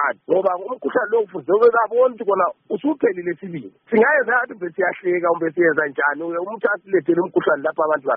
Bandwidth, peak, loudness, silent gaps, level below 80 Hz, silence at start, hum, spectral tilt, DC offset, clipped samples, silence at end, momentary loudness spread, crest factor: 4.6 kHz; -4 dBFS; -19 LUFS; none; -70 dBFS; 0 s; none; -4.5 dB/octave; under 0.1%; under 0.1%; 0 s; 10 LU; 14 dB